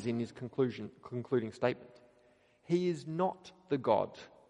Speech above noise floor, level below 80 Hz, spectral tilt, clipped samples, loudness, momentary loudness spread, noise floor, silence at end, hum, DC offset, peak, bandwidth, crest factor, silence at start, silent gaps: 33 dB; -76 dBFS; -7.5 dB/octave; under 0.1%; -35 LUFS; 12 LU; -67 dBFS; 0.2 s; none; under 0.1%; -14 dBFS; 10 kHz; 20 dB; 0 s; none